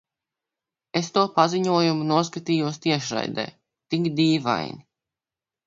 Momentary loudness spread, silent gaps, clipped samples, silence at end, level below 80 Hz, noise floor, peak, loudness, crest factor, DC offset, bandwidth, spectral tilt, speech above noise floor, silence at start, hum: 9 LU; none; under 0.1%; 0.85 s; -66 dBFS; under -90 dBFS; -4 dBFS; -23 LUFS; 20 dB; under 0.1%; 7.8 kHz; -5.5 dB/octave; over 67 dB; 0.95 s; none